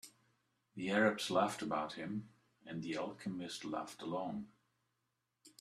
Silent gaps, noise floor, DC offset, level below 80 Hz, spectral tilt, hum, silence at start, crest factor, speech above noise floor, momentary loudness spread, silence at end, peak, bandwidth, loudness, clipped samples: none; -86 dBFS; under 0.1%; -78 dBFS; -4.5 dB/octave; none; 0.05 s; 22 dB; 47 dB; 16 LU; 0.1 s; -18 dBFS; 14 kHz; -39 LUFS; under 0.1%